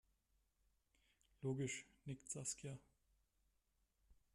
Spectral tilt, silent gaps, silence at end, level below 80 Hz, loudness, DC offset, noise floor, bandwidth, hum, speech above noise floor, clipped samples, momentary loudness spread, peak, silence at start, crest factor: -4.5 dB/octave; none; 0.2 s; -78 dBFS; -48 LUFS; under 0.1%; -84 dBFS; 13.5 kHz; none; 36 dB; under 0.1%; 10 LU; -30 dBFS; 1.4 s; 22 dB